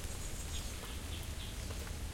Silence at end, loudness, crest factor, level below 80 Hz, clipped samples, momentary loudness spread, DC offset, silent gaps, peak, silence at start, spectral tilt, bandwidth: 0 s; -43 LUFS; 14 dB; -44 dBFS; under 0.1%; 1 LU; under 0.1%; none; -28 dBFS; 0 s; -3.5 dB/octave; 16.5 kHz